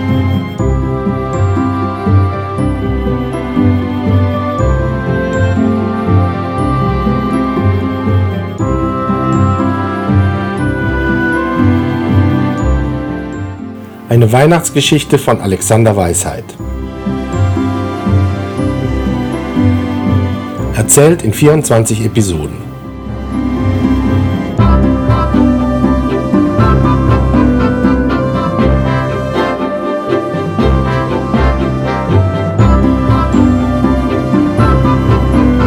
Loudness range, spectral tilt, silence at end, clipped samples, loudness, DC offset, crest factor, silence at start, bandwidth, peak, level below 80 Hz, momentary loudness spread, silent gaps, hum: 3 LU; -6 dB/octave; 0 s; 0.3%; -12 LUFS; under 0.1%; 12 dB; 0 s; over 20 kHz; 0 dBFS; -22 dBFS; 7 LU; none; none